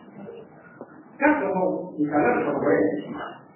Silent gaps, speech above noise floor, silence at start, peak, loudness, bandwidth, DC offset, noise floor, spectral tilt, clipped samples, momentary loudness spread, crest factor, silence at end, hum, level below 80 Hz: none; 22 dB; 0.05 s; -6 dBFS; -23 LUFS; 3.1 kHz; under 0.1%; -45 dBFS; -11 dB/octave; under 0.1%; 23 LU; 18 dB; 0.15 s; none; -60 dBFS